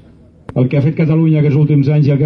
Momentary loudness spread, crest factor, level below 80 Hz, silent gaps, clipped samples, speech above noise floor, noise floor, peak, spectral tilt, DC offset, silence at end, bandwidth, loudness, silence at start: 4 LU; 10 dB; -46 dBFS; none; under 0.1%; 25 dB; -36 dBFS; -2 dBFS; -11 dB/octave; under 0.1%; 0 s; 5.2 kHz; -13 LUFS; 0.55 s